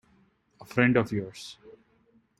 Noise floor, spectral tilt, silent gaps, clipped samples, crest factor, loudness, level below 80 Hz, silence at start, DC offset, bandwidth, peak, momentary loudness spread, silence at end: -65 dBFS; -6.5 dB/octave; none; under 0.1%; 22 dB; -26 LUFS; -62 dBFS; 0.6 s; under 0.1%; 13 kHz; -8 dBFS; 20 LU; 0.7 s